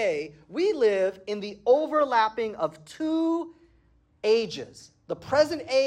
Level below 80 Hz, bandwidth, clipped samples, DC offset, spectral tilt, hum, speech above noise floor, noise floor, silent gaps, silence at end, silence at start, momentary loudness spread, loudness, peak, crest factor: -66 dBFS; 13 kHz; under 0.1%; under 0.1%; -4.5 dB/octave; none; 37 dB; -62 dBFS; none; 0 s; 0 s; 13 LU; -26 LUFS; -10 dBFS; 16 dB